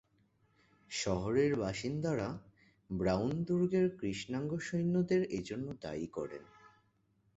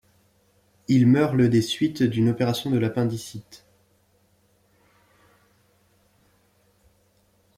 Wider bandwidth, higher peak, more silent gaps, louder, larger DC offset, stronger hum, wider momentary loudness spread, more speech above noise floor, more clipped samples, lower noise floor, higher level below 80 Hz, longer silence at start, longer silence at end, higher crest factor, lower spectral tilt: second, 8 kHz vs 15.5 kHz; second, -18 dBFS vs -8 dBFS; neither; second, -35 LUFS vs -22 LUFS; neither; neither; second, 11 LU vs 17 LU; second, 39 dB vs 43 dB; neither; first, -74 dBFS vs -64 dBFS; about the same, -60 dBFS vs -62 dBFS; about the same, 0.9 s vs 0.9 s; second, 0.7 s vs 4 s; about the same, 18 dB vs 18 dB; about the same, -6 dB/octave vs -6.5 dB/octave